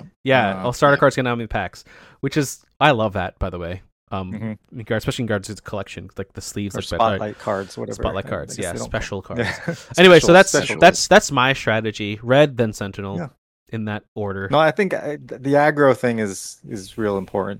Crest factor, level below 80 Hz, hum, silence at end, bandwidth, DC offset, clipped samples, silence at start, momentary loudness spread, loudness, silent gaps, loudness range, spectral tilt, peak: 18 dB; -42 dBFS; none; 0 s; 16.5 kHz; under 0.1%; under 0.1%; 0.05 s; 17 LU; -19 LUFS; 0.16-0.24 s, 3.92-4.07 s, 13.38-13.66 s, 14.08-14.16 s; 11 LU; -4.5 dB/octave; 0 dBFS